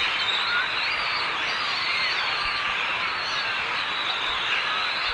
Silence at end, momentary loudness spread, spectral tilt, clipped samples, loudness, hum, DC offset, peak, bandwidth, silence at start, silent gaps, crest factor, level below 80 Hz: 0 s; 2 LU; -1 dB/octave; under 0.1%; -24 LUFS; none; under 0.1%; -12 dBFS; 11 kHz; 0 s; none; 14 dB; -56 dBFS